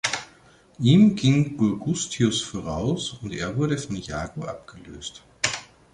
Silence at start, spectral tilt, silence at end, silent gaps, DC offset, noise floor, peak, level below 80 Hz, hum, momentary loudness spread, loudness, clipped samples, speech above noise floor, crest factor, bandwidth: 0.05 s; -5 dB/octave; 0.3 s; none; under 0.1%; -54 dBFS; -2 dBFS; -50 dBFS; none; 19 LU; -24 LUFS; under 0.1%; 31 dB; 22 dB; 11 kHz